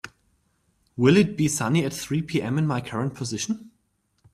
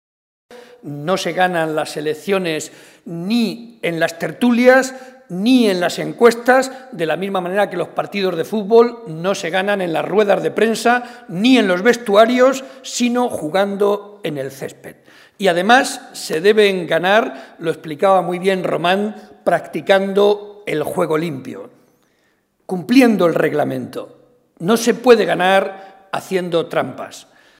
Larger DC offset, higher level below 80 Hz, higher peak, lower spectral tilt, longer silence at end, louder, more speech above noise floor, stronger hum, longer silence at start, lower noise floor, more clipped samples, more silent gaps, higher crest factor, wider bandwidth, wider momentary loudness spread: neither; first, -58 dBFS vs -66 dBFS; second, -6 dBFS vs 0 dBFS; about the same, -5.5 dB/octave vs -4.5 dB/octave; first, 0.65 s vs 0.4 s; second, -24 LUFS vs -17 LUFS; about the same, 47 dB vs 45 dB; neither; second, 0.05 s vs 0.5 s; first, -70 dBFS vs -62 dBFS; neither; neither; about the same, 20 dB vs 16 dB; about the same, 15 kHz vs 16 kHz; second, 11 LU vs 14 LU